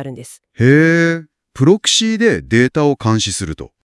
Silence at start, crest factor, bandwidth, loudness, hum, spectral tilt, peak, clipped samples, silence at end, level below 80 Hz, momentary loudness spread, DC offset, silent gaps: 0 s; 14 dB; 12 kHz; -14 LUFS; none; -4.5 dB/octave; 0 dBFS; under 0.1%; 0.3 s; -46 dBFS; 15 LU; under 0.1%; none